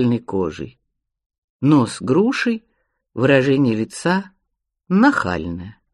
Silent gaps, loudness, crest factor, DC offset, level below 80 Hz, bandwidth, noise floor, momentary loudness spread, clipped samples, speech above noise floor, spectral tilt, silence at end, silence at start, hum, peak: 1.26-1.30 s, 1.38-1.59 s; -18 LUFS; 18 dB; under 0.1%; -52 dBFS; 11 kHz; -76 dBFS; 14 LU; under 0.1%; 58 dB; -6.5 dB/octave; 0.2 s; 0 s; none; -2 dBFS